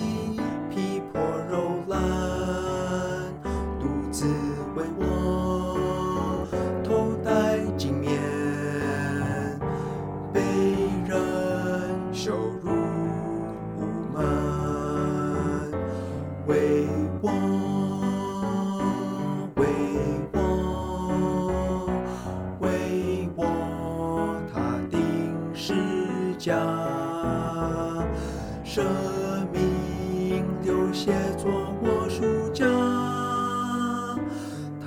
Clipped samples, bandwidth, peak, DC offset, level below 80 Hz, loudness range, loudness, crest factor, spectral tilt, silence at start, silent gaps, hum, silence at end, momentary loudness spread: under 0.1%; 16.5 kHz; -10 dBFS; under 0.1%; -42 dBFS; 2 LU; -27 LUFS; 16 dB; -6.5 dB/octave; 0 s; none; none; 0 s; 6 LU